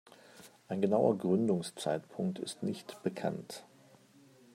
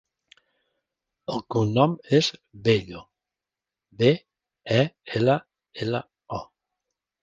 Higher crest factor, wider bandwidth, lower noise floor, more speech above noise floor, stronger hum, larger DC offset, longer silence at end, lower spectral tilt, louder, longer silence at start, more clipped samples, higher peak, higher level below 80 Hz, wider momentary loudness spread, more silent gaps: about the same, 20 dB vs 22 dB; first, 15 kHz vs 9.2 kHz; second, -61 dBFS vs -89 dBFS; second, 28 dB vs 66 dB; neither; neither; about the same, 0.9 s vs 0.8 s; about the same, -6.5 dB/octave vs -6.5 dB/octave; second, -34 LUFS vs -24 LUFS; second, 0.35 s vs 1.3 s; neither; second, -14 dBFS vs -4 dBFS; second, -78 dBFS vs -58 dBFS; about the same, 17 LU vs 15 LU; neither